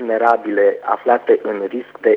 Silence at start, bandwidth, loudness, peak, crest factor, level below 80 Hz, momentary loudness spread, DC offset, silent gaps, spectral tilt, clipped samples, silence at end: 0 s; 5.4 kHz; -17 LUFS; 0 dBFS; 16 dB; -70 dBFS; 8 LU; under 0.1%; none; -7 dB/octave; under 0.1%; 0 s